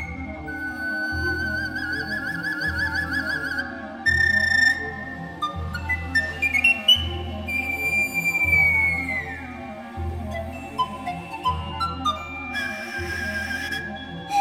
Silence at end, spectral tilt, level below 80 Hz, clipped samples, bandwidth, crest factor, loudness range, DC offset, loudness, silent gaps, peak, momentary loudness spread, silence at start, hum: 0 s; -3.5 dB/octave; -44 dBFS; under 0.1%; 17.5 kHz; 18 dB; 9 LU; under 0.1%; -23 LUFS; none; -6 dBFS; 15 LU; 0 s; none